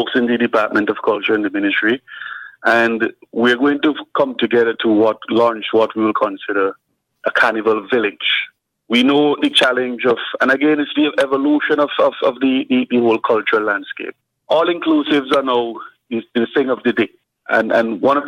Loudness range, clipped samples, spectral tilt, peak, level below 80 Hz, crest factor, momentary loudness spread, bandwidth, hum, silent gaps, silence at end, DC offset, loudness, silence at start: 2 LU; under 0.1%; -5 dB/octave; -2 dBFS; -66 dBFS; 16 dB; 8 LU; 11 kHz; none; none; 0 s; under 0.1%; -16 LUFS; 0 s